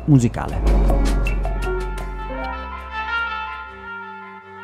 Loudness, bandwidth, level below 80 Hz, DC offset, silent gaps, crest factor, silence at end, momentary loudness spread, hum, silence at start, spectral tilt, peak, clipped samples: -23 LUFS; 12 kHz; -24 dBFS; under 0.1%; none; 18 dB; 0 s; 14 LU; none; 0 s; -7 dB/octave; -2 dBFS; under 0.1%